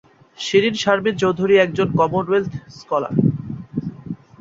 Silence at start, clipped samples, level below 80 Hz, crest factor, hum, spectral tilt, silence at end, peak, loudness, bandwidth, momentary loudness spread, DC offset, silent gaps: 0.4 s; under 0.1%; -52 dBFS; 18 dB; none; -6 dB/octave; 0.25 s; -2 dBFS; -19 LUFS; 7.8 kHz; 14 LU; under 0.1%; none